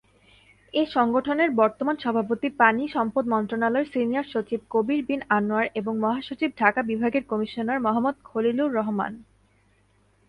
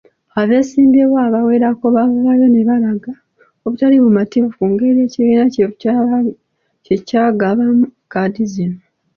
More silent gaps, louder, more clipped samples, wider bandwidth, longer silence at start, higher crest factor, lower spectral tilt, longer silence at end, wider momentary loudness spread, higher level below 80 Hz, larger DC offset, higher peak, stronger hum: neither; second, -24 LUFS vs -14 LUFS; neither; first, 9.6 kHz vs 7 kHz; first, 0.75 s vs 0.35 s; first, 22 dB vs 10 dB; about the same, -7.5 dB/octave vs -8 dB/octave; first, 1.05 s vs 0.4 s; second, 7 LU vs 10 LU; second, -62 dBFS vs -56 dBFS; neither; about the same, -4 dBFS vs -2 dBFS; neither